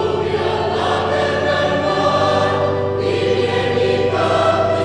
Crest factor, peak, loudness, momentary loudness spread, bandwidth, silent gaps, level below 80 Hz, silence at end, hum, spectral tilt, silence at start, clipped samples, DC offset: 14 dB; -2 dBFS; -17 LUFS; 3 LU; 10 kHz; none; -46 dBFS; 0 s; none; -5.5 dB/octave; 0 s; under 0.1%; under 0.1%